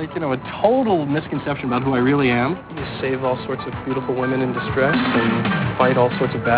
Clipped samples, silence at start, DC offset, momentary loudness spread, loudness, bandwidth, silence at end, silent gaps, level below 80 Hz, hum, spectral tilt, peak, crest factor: under 0.1%; 0 s; under 0.1%; 8 LU; -20 LUFS; 4 kHz; 0 s; none; -46 dBFS; none; -10.5 dB/octave; -4 dBFS; 16 dB